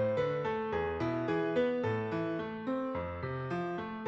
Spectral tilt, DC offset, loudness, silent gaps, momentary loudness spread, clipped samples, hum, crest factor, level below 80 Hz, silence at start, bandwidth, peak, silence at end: -8 dB/octave; under 0.1%; -34 LUFS; none; 6 LU; under 0.1%; none; 14 dB; -58 dBFS; 0 s; 7.6 kHz; -20 dBFS; 0 s